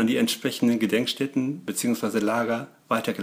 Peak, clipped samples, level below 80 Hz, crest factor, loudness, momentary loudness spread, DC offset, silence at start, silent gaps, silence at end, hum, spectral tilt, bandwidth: -8 dBFS; under 0.1%; -72 dBFS; 16 dB; -25 LUFS; 5 LU; under 0.1%; 0 s; none; 0 s; none; -4 dB/octave; 16 kHz